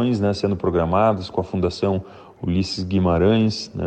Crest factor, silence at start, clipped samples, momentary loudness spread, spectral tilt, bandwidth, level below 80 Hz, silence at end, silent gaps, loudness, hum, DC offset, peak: 14 dB; 0 s; under 0.1%; 7 LU; -7 dB/octave; 9 kHz; -42 dBFS; 0 s; none; -21 LUFS; none; under 0.1%; -6 dBFS